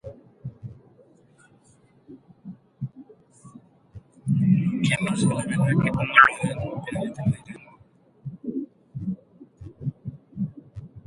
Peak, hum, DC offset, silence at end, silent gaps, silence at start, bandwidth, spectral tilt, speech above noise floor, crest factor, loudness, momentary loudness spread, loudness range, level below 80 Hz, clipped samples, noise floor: 0 dBFS; none; under 0.1%; 0.05 s; none; 0.05 s; 11.5 kHz; -6 dB/octave; 36 dB; 26 dB; -24 LUFS; 25 LU; 22 LU; -54 dBFS; under 0.1%; -58 dBFS